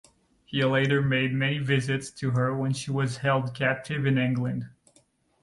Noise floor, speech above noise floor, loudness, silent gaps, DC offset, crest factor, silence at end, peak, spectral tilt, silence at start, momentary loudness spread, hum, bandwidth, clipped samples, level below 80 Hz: -64 dBFS; 39 dB; -26 LUFS; none; under 0.1%; 16 dB; 0.75 s; -10 dBFS; -6 dB/octave; 0.5 s; 7 LU; none; 11.5 kHz; under 0.1%; -60 dBFS